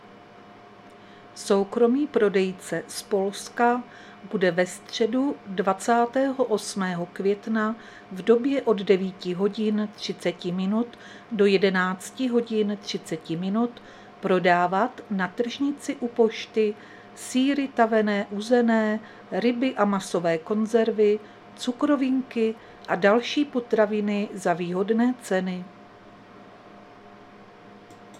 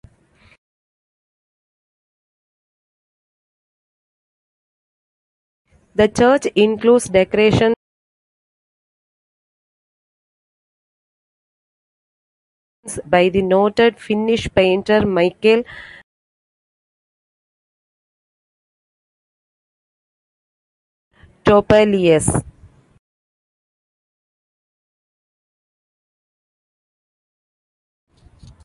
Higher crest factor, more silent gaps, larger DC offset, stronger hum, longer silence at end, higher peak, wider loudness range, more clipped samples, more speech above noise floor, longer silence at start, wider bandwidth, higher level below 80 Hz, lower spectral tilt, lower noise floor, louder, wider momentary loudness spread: about the same, 20 dB vs 20 dB; second, none vs 7.76-12.83 s, 16.03-21.11 s; neither; neither; second, 0 s vs 6.2 s; second, -6 dBFS vs 0 dBFS; second, 2 LU vs 8 LU; neither; second, 24 dB vs 39 dB; second, 0.05 s vs 6 s; first, 14 kHz vs 11.5 kHz; second, -70 dBFS vs -46 dBFS; about the same, -5.5 dB/octave vs -5.5 dB/octave; second, -48 dBFS vs -54 dBFS; second, -25 LUFS vs -15 LUFS; about the same, 11 LU vs 9 LU